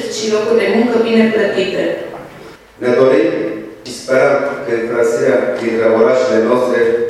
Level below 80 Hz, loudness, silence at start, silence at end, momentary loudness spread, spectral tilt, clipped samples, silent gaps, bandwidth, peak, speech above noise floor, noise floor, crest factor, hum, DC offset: -54 dBFS; -14 LUFS; 0 s; 0 s; 12 LU; -5 dB/octave; under 0.1%; none; 12.5 kHz; 0 dBFS; 23 dB; -36 dBFS; 14 dB; none; under 0.1%